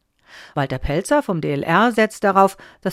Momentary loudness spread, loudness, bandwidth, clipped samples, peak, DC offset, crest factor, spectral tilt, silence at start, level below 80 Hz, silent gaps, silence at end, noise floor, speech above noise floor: 9 LU; -19 LUFS; 16 kHz; under 0.1%; -2 dBFS; under 0.1%; 18 dB; -5.5 dB/octave; 0.35 s; -38 dBFS; none; 0 s; -45 dBFS; 27 dB